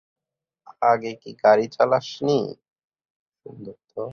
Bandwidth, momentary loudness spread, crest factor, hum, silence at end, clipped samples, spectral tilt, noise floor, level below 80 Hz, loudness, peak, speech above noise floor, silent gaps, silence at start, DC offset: 7 kHz; 21 LU; 20 dB; none; 0 s; under 0.1%; -6 dB/octave; -68 dBFS; -68 dBFS; -21 LUFS; -4 dBFS; 47 dB; 2.72-2.76 s, 2.84-2.90 s, 3.05-3.32 s; 0.8 s; under 0.1%